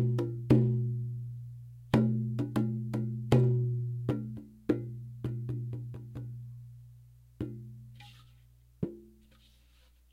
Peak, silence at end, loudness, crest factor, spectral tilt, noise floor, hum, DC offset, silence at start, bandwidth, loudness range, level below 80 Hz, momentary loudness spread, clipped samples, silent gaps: -8 dBFS; 1.05 s; -33 LUFS; 24 dB; -9 dB/octave; -62 dBFS; 60 Hz at -50 dBFS; under 0.1%; 0 s; 7.4 kHz; 15 LU; -58 dBFS; 23 LU; under 0.1%; none